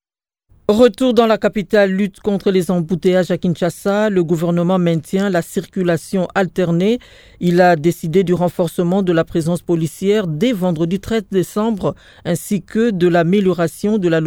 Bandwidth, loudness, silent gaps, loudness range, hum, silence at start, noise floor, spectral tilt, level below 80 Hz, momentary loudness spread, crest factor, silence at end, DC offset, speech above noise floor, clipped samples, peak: 17 kHz; -16 LUFS; none; 2 LU; none; 0.7 s; -75 dBFS; -6.5 dB/octave; -46 dBFS; 7 LU; 16 dB; 0 s; under 0.1%; 59 dB; under 0.1%; 0 dBFS